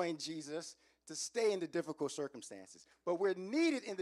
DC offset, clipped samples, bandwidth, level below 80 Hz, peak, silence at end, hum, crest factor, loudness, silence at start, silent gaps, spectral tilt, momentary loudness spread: under 0.1%; under 0.1%; 12.5 kHz; -88 dBFS; -24 dBFS; 0 s; none; 16 dB; -38 LUFS; 0 s; none; -3.5 dB/octave; 17 LU